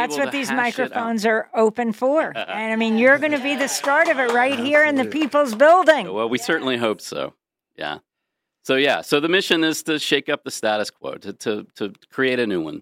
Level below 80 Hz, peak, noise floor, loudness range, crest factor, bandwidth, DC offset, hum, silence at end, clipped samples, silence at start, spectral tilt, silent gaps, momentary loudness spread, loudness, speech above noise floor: -72 dBFS; -2 dBFS; -80 dBFS; 5 LU; 18 dB; 16 kHz; under 0.1%; none; 0 s; under 0.1%; 0 s; -3.5 dB/octave; none; 14 LU; -19 LUFS; 61 dB